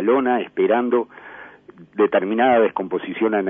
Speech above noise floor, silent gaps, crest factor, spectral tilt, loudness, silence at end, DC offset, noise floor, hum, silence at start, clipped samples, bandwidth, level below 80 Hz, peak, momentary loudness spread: 23 dB; none; 14 dB; -9 dB/octave; -19 LUFS; 0 s; under 0.1%; -42 dBFS; 50 Hz at -60 dBFS; 0 s; under 0.1%; 3.7 kHz; -64 dBFS; -6 dBFS; 18 LU